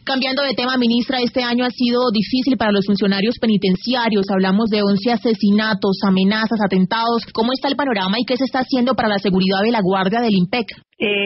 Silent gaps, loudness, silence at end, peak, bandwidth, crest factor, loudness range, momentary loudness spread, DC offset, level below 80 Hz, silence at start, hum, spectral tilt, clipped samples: none; -17 LUFS; 0 s; -4 dBFS; 6 kHz; 12 dB; 1 LU; 3 LU; under 0.1%; -52 dBFS; 0.05 s; none; -4 dB/octave; under 0.1%